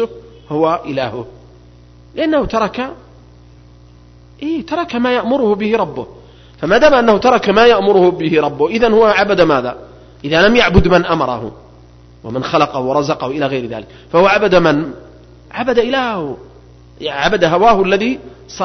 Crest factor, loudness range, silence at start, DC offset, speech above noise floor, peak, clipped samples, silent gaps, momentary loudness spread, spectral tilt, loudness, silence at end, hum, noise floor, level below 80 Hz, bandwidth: 14 dB; 8 LU; 0 s; under 0.1%; 29 dB; 0 dBFS; under 0.1%; none; 17 LU; -6 dB/octave; -13 LUFS; 0 s; 60 Hz at -40 dBFS; -42 dBFS; -34 dBFS; 6.4 kHz